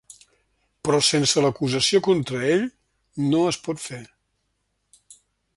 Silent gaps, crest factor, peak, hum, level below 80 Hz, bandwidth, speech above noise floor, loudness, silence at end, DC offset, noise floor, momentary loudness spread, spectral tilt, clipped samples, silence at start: none; 18 dB; -6 dBFS; none; -60 dBFS; 11.5 kHz; 52 dB; -21 LUFS; 1.5 s; under 0.1%; -73 dBFS; 14 LU; -4 dB/octave; under 0.1%; 0.85 s